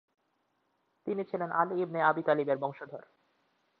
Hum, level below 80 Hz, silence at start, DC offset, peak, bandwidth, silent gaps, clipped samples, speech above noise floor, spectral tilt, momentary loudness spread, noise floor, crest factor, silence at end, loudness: none; -84 dBFS; 1.05 s; under 0.1%; -12 dBFS; 5 kHz; none; under 0.1%; 46 dB; -9.5 dB/octave; 17 LU; -77 dBFS; 22 dB; 0.8 s; -31 LUFS